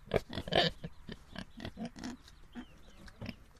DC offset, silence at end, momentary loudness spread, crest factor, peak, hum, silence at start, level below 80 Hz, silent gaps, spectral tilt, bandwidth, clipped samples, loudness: under 0.1%; 0 s; 22 LU; 26 dB; -12 dBFS; none; 0 s; -54 dBFS; none; -5 dB/octave; 14.5 kHz; under 0.1%; -37 LUFS